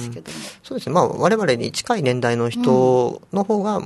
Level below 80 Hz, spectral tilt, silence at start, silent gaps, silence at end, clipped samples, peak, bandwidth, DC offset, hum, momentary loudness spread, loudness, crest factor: -60 dBFS; -5.5 dB/octave; 0 s; none; 0 s; under 0.1%; -2 dBFS; 12.5 kHz; under 0.1%; none; 15 LU; -19 LUFS; 18 dB